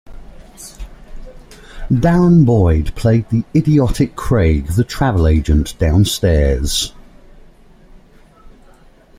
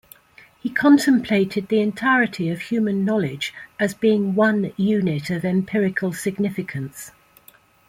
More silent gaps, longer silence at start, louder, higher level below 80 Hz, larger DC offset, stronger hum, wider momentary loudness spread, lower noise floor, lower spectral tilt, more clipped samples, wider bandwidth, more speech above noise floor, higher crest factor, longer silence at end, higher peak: neither; second, 0.1 s vs 0.65 s; first, -14 LUFS vs -21 LUFS; first, -24 dBFS vs -60 dBFS; neither; neither; about the same, 10 LU vs 12 LU; second, -45 dBFS vs -53 dBFS; about the same, -6.5 dB/octave vs -6 dB/octave; neither; about the same, 16 kHz vs 16 kHz; about the same, 32 dB vs 33 dB; about the same, 14 dB vs 16 dB; about the same, 0.7 s vs 0.8 s; about the same, -2 dBFS vs -4 dBFS